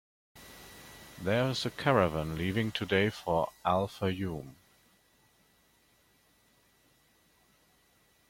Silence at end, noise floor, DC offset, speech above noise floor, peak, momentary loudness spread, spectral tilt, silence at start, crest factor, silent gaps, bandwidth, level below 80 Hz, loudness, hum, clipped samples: 3.8 s; -68 dBFS; under 0.1%; 37 dB; -10 dBFS; 22 LU; -6 dB/octave; 0.35 s; 24 dB; none; 16.5 kHz; -60 dBFS; -31 LUFS; none; under 0.1%